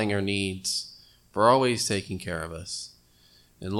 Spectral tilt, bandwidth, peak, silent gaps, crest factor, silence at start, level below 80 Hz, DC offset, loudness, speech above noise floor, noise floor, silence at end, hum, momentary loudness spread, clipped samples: -4 dB/octave; 17 kHz; -4 dBFS; none; 22 dB; 0 s; -60 dBFS; under 0.1%; -26 LUFS; 33 dB; -59 dBFS; 0 s; 60 Hz at -55 dBFS; 16 LU; under 0.1%